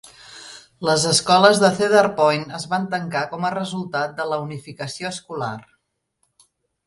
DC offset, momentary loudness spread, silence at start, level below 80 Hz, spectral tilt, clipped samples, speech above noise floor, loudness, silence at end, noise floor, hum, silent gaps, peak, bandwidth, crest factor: under 0.1%; 21 LU; 0.05 s; -62 dBFS; -3.5 dB/octave; under 0.1%; 51 dB; -20 LUFS; 1.25 s; -71 dBFS; none; none; 0 dBFS; 11.5 kHz; 22 dB